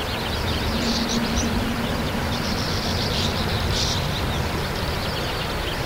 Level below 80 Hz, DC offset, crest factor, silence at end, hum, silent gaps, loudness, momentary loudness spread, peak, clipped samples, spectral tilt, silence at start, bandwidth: -32 dBFS; under 0.1%; 14 dB; 0 s; none; none; -24 LUFS; 3 LU; -10 dBFS; under 0.1%; -4 dB/octave; 0 s; 16 kHz